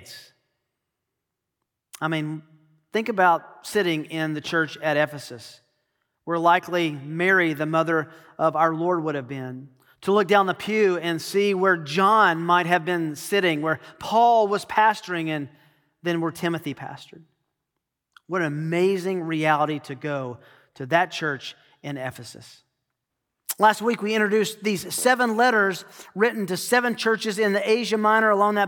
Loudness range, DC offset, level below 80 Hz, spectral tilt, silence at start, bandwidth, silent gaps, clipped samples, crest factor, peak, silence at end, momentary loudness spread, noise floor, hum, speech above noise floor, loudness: 7 LU; under 0.1%; -74 dBFS; -4.5 dB/octave; 0.05 s; 19.5 kHz; none; under 0.1%; 20 dB; -4 dBFS; 0 s; 15 LU; -82 dBFS; none; 60 dB; -22 LUFS